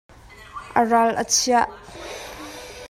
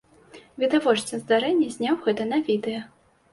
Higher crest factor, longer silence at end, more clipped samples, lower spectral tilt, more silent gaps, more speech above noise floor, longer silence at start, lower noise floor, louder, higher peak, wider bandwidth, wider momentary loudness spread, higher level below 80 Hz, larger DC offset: about the same, 20 dB vs 18 dB; second, 0 s vs 0.45 s; neither; second, -2 dB/octave vs -4.5 dB/octave; neither; second, 21 dB vs 27 dB; about the same, 0.4 s vs 0.35 s; second, -40 dBFS vs -50 dBFS; first, -20 LUFS vs -24 LUFS; about the same, -4 dBFS vs -6 dBFS; first, 16 kHz vs 11.5 kHz; first, 20 LU vs 6 LU; first, -52 dBFS vs -68 dBFS; neither